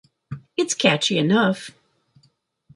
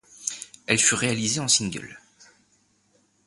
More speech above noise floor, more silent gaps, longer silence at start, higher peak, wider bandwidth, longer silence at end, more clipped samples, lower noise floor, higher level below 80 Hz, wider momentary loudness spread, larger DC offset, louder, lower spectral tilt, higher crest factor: about the same, 44 dB vs 42 dB; neither; about the same, 0.3 s vs 0.2 s; about the same, -4 dBFS vs -4 dBFS; about the same, 11.5 kHz vs 12 kHz; second, 1.05 s vs 1.3 s; neither; about the same, -64 dBFS vs -65 dBFS; about the same, -64 dBFS vs -60 dBFS; first, 21 LU vs 17 LU; neither; about the same, -20 LUFS vs -22 LUFS; first, -4 dB/octave vs -2 dB/octave; about the same, 20 dB vs 24 dB